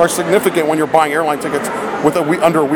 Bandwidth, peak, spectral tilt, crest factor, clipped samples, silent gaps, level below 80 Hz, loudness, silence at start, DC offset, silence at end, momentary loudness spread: over 20 kHz; 0 dBFS; -4.5 dB/octave; 14 dB; under 0.1%; none; -54 dBFS; -15 LUFS; 0 s; under 0.1%; 0 s; 6 LU